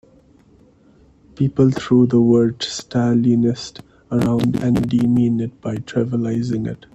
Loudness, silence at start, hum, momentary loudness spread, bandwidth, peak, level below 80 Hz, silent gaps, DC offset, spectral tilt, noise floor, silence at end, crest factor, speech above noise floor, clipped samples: -18 LUFS; 1.4 s; none; 10 LU; 8.8 kHz; -4 dBFS; -48 dBFS; none; under 0.1%; -7.5 dB/octave; -51 dBFS; 0.2 s; 16 dB; 34 dB; under 0.1%